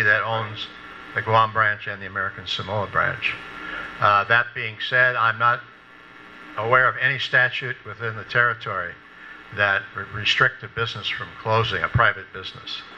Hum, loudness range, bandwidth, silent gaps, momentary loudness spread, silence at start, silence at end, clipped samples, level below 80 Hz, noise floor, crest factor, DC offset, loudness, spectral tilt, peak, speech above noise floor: none; 3 LU; 8.2 kHz; none; 15 LU; 0 s; 0 s; under 0.1%; -52 dBFS; -46 dBFS; 20 dB; under 0.1%; -21 LUFS; -4.5 dB/octave; -2 dBFS; 23 dB